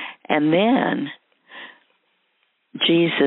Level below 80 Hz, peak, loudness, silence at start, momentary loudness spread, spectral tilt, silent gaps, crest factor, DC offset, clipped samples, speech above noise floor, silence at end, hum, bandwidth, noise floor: -72 dBFS; -4 dBFS; -19 LUFS; 0 s; 22 LU; -3 dB/octave; none; 18 dB; under 0.1%; under 0.1%; 50 dB; 0 s; none; 4.1 kHz; -68 dBFS